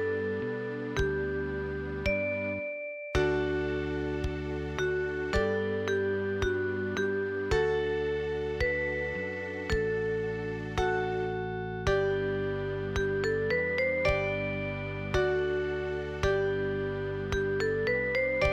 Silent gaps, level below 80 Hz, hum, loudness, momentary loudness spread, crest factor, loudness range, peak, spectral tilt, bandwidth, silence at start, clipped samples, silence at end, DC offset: none; -44 dBFS; none; -31 LUFS; 6 LU; 16 dB; 2 LU; -14 dBFS; -6.5 dB/octave; 8.8 kHz; 0 s; under 0.1%; 0 s; under 0.1%